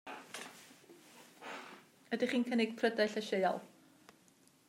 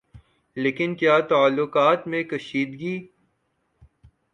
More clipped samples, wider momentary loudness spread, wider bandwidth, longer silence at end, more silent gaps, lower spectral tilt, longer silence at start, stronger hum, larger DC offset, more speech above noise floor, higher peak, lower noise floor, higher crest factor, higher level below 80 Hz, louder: neither; first, 24 LU vs 12 LU; first, 16 kHz vs 9.4 kHz; second, 1 s vs 1.3 s; neither; second, -4.5 dB/octave vs -6.5 dB/octave; about the same, 0.05 s vs 0.15 s; neither; neither; second, 33 dB vs 50 dB; second, -18 dBFS vs -6 dBFS; second, -67 dBFS vs -72 dBFS; about the same, 20 dB vs 18 dB; second, under -90 dBFS vs -62 dBFS; second, -36 LUFS vs -22 LUFS